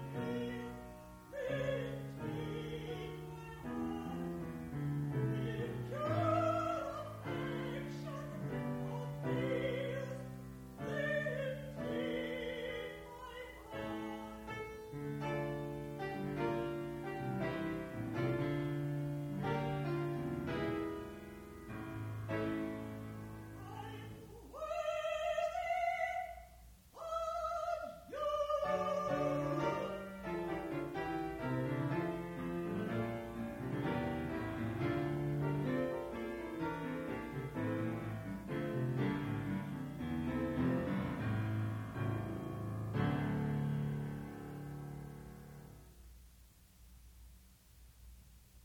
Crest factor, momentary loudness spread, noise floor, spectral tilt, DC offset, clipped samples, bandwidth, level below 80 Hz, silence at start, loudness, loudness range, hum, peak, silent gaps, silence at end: 18 dB; 12 LU; -62 dBFS; -7.5 dB/octave; under 0.1%; under 0.1%; 17 kHz; -60 dBFS; 0 s; -40 LUFS; 5 LU; none; -22 dBFS; none; 0 s